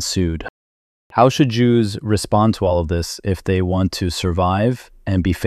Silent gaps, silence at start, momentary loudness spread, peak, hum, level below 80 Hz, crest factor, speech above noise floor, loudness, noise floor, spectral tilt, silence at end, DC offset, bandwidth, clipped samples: 0.50-1.10 s; 0 s; 8 LU; -2 dBFS; none; -36 dBFS; 16 dB; over 73 dB; -18 LUFS; under -90 dBFS; -6 dB/octave; 0 s; under 0.1%; 14 kHz; under 0.1%